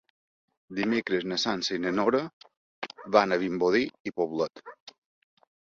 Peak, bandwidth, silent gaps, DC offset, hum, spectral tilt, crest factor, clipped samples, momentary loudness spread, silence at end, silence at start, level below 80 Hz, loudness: -6 dBFS; 7.8 kHz; 2.33-2.41 s, 2.57-2.82 s, 4.00-4.05 s, 4.80-4.87 s; under 0.1%; none; -4.5 dB/octave; 22 dB; under 0.1%; 16 LU; 0.75 s; 0.7 s; -68 dBFS; -27 LUFS